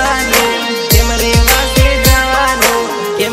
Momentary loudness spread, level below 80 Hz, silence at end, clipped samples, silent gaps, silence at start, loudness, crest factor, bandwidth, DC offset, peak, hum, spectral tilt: 6 LU; -18 dBFS; 0 s; 0.4%; none; 0 s; -10 LUFS; 10 dB; over 20 kHz; under 0.1%; 0 dBFS; none; -3.5 dB/octave